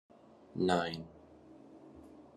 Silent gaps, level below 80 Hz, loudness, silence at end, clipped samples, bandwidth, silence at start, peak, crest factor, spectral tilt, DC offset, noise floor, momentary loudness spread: none; -72 dBFS; -35 LUFS; 0.15 s; under 0.1%; 12 kHz; 0.55 s; -16 dBFS; 24 dB; -6 dB/octave; under 0.1%; -57 dBFS; 26 LU